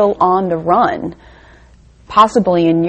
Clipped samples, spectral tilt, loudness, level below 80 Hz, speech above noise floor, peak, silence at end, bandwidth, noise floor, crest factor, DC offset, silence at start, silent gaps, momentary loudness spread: 0.1%; -7 dB/octave; -13 LUFS; -44 dBFS; 31 dB; 0 dBFS; 0 s; 8.8 kHz; -44 dBFS; 14 dB; under 0.1%; 0 s; none; 8 LU